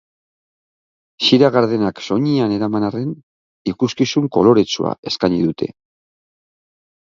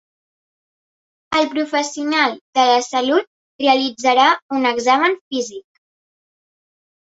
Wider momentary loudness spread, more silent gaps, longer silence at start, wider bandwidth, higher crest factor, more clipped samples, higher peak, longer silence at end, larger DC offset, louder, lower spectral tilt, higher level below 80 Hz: first, 13 LU vs 7 LU; second, 3.23-3.65 s, 4.98-5.03 s vs 2.41-2.53 s, 3.27-3.59 s, 4.42-4.49 s, 5.21-5.31 s; about the same, 1.2 s vs 1.3 s; about the same, 7.6 kHz vs 8 kHz; about the same, 18 dB vs 18 dB; neither; about the same, 0 dBFS vs -2 dBFS; second, 1.35 s vs 1.6 s; neither; about the same, -17 LUFS vs -17 LUFS; first, -6 dB/octave vs -1.5 dB/octave; first, -54 dBFS vs -64 dBFS